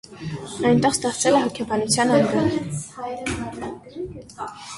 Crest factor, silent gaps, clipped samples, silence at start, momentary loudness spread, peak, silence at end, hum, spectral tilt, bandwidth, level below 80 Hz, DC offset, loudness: 18 dB; none; under 0.1%; 0.05 s; 16 LU; -4 dBFS; 0 s; none; -4.5 dB/octave; 11.5 kHz; -50 dBFS; under 0.1%; -21 LUFS